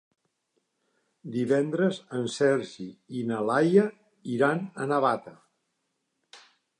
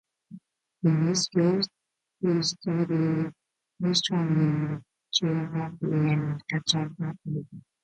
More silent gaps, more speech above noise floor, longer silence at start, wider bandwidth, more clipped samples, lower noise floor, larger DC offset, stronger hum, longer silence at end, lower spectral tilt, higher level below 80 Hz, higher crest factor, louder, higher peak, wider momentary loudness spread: neither; first, 52 dB vs 24 dB; first, 1.25 s vs 0.3 s; first, 11 kHz vs 9.2 kHz; neither; first, -79 dBFS vs -50 dBFS; neither; neither; first, 0.45 s vs 0.25 s; about the same, -6.5 dB/octave vs -5.5 dB/octave; second, -78 dBFS vs -66 dBFS; about the same, 20 dB vs 18 dB; about the same, -27 LUFS vs -27 LUFS; about the same, -8 dBFS vs -10 dBFS; first, 14 LU vs 10 LU